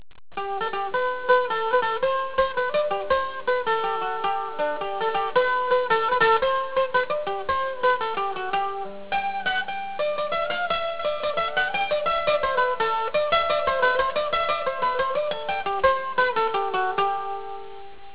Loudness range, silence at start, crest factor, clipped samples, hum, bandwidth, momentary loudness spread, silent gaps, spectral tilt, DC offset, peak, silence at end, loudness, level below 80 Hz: 3 LU; 0.1 s; 18 dB; under 0.1%; none; 4 kHz; 6 LU; none; -6.5 dB/octave; 1%; -6 dBFS; 0 s; -24 LUFS; -54 dBFS